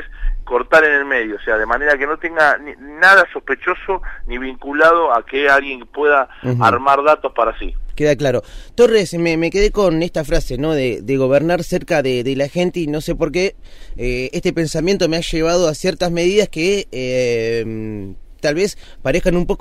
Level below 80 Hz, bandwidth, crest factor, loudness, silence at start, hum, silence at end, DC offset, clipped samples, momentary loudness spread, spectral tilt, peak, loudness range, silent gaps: -30 dBFS; 15.5 kHz; 14 dB; -16 LUFS; 0 s; none; 0 s; under 0.1%; under 0.1%; 11 LU; -5 dB/octave; -2 dBFS; 4 LU; none